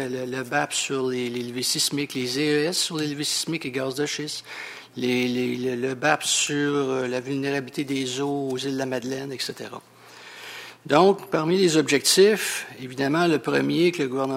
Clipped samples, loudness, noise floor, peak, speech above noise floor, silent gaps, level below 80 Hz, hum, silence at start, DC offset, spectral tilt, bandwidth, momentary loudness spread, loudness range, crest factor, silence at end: under 0.1%; -23 LUFS; -45 dBFS; -4 dBFS; 21 dB; none; -70 dBFS; none; 0 s; under 0.1%; -3.5 dB/octave; 16 kHz; 13 LU; 7 LU; 20 dB; 0 s